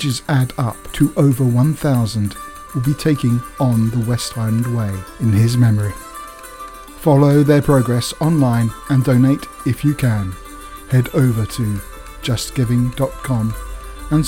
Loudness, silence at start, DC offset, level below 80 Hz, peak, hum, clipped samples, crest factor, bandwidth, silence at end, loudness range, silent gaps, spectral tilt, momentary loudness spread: -17 LUFS; 0 s; under 0.1%; -36 dBFS; 0 dBFS; none; under 0.1%; 16 dB; 17 kHz; 0 s; 4 LU; none; -7 dB/octave; 18 LU